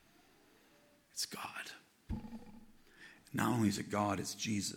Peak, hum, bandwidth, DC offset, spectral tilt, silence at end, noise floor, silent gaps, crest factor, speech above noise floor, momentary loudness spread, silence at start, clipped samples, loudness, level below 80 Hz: -18 dBFS; none; 18.5 kHz; under 0.1%; -4.5 dB/octave; 0 s; -68 dBFS; none; 22 dB; 30 dB; 23 LU; 1.15 s; under 0.1%; -38 LUFS; -60 dBFS